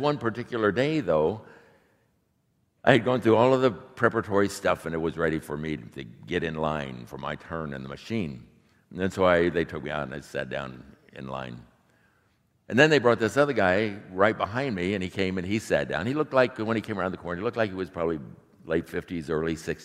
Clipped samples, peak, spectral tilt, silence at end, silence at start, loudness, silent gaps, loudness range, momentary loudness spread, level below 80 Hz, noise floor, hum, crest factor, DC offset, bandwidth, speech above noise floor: under 0.1%; -2 dBFS; -6 dB/octave; 0 s; 0 s; -26 LUFS; none; 7 LU; 15 LU; -56 dBFS; -71 dBFS; none; 26 dB; under 0.1%; 15 kHz; 44 dB